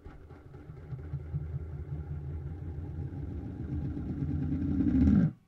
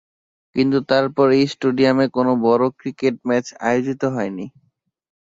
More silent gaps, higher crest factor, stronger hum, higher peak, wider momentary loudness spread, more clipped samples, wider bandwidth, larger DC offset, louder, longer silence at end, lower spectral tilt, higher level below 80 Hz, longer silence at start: neither; about the same, 20 dB vs 16 dB; neither; second, -12 dBFS vs -4 dBFS; first, 22 LU vs 9 LU; neither; second, 5.8 kHz vs 7.8 kHz; neither; second, -33 LUFS vs -19 LUFS; second, 0.1 s vs 0.75 s; first, -11 dB/octave vs -6.5 dB/octave; first, -42 dBFS vs -60 dBFS; second, 0 s vs 0.55 s